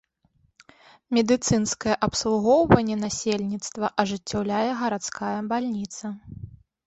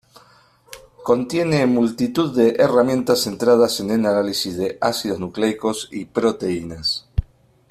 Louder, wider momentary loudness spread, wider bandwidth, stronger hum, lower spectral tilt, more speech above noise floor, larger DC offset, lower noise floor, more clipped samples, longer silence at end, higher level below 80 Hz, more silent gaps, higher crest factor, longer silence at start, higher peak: second, -24 LUFS vs -19 LUFS; first, 14 LU vs 9 LU; second, 8.2 kHz vs 14.5 kHz; neither; about the same, -4.5 dB/octave vs -5 dB/octave; first, 42 dB vs 34 dB; neither; first, -66 dBFS vs -53 dBFS; neither; second, 0.3 s vs 0.45 s; second, -48 dBFS vs -42 dBFS; neither; first, 24 dB vs 18 dB; first, 1.1 s vs 0.7 s; about the same, -2 dBFS vs -2 dBFS